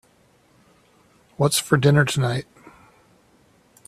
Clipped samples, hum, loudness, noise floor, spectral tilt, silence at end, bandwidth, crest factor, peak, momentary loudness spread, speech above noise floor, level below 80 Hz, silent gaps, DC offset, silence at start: under 0.1%; none; -20 LUFS; -59 dBFS; -5 dB/octave; 1.45 s; 14 kHz; 22 dB; -2 dBFS; 8 LU; 40 dB; -58 dBFS; none; under 0.1%; 1.4 s